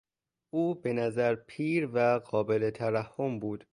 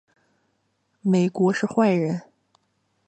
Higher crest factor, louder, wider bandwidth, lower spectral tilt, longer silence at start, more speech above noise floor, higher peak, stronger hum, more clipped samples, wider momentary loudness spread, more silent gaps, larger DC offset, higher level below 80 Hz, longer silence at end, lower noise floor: about the same, 16 dB vs 18 dB; second, -30 LUFS vs -22 LUFS; first, 11 kHz vs 8.8 kHz; about the same, -8 dB/octave vs -7.5 dB/octave; second, 0.55 s vs 1.05 s; second, 27 dB vs 50 dB; second, -14 dBFS vs -6 dBFS; neither; neither; second, 6 LU vs 9 LU; neither; neither; about the same, -68 dBFS vs -72 dBFS; second, 0.15 s vs 0.85 s; second, -56 dBFS vs -71 dBFS